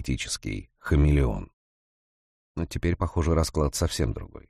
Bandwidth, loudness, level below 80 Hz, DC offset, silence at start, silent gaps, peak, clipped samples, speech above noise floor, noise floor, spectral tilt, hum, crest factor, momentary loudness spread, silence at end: 14.5 kHz; -27 LUFS; -32 dBFS; under 0.1%; 0 s; 1.53-2.55 s; -12 dBFS; under 0.1%; over 64 dB; under -90 dBFS; -5.5 dB/octave; none; 16 dB; 13 LU; 0.1 s